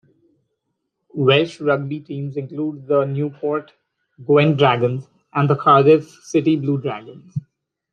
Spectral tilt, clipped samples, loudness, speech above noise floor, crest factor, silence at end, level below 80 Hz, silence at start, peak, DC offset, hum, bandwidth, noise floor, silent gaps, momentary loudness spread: -7 dB/octave; under 0.1%; -18 LUFS; 57 dB; 18 dB; 0.55 s; -64 dBFS; 1.15 s; -2 dBFS; under 0.1%; none; 9 kHz; -75 dBFS; none; 17 LU